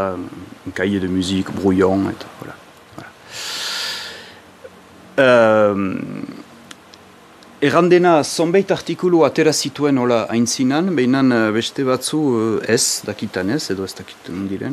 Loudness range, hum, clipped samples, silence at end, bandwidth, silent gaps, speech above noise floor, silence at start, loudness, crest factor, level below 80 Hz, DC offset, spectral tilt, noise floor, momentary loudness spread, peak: 6 LU; none; under 0.1%; 0 s; 14.5 kHz; none; 27 dB; 0 s; -17 LUFS; 18 dB; -58 dBFS; under 0.1%; -4.5 dB/octave; -44 dBFS; 19 LU; 0 dBFS